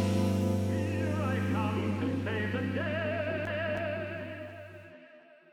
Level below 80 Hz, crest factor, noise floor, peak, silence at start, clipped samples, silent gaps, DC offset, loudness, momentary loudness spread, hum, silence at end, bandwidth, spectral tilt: -66 dBFS; 14 dB; -56 dBFS; -18 dBFS; 0 s; under 0.1%; none; under 0.1%; -32 LUFS; 14 LU; none; 0.35 s; 13.5 kHz; -7 dB/octave